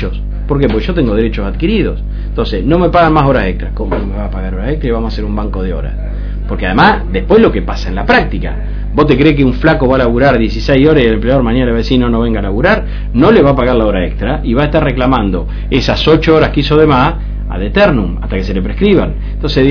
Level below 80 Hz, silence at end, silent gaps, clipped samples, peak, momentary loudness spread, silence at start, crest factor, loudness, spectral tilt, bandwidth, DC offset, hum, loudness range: -18 dBFS; 0 s; none; 0.7%; 0 dBFS; 11 LU; 0 s; 10 dB; -12 LUFS; -8 dB/octave; 5.4 kHz; under 0.1%; 50 Hz at -20 dBFS; 3 LU